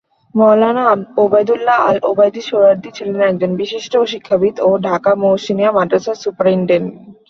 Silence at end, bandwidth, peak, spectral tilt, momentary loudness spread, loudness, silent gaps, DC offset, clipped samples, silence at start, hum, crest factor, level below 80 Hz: 0.2 s; 7.2 kHz; 0 dBFS; -6.5 dB/octave; 6 LU; -14 LUFS; none; under 0.1%; under 0.1%; 0.35 s; none; 12 dB; -58 dBFS